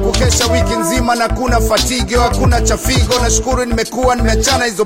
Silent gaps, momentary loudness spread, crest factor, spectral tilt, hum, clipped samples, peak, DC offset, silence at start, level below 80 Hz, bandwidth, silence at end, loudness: none; 2 LU; 12 dB; -4 dB/octave; none; under 0.1%; 0 dBFS; 0.4%; 0 s; -18 dBFS; 16.5 kHz; 0 s; -13 LUFS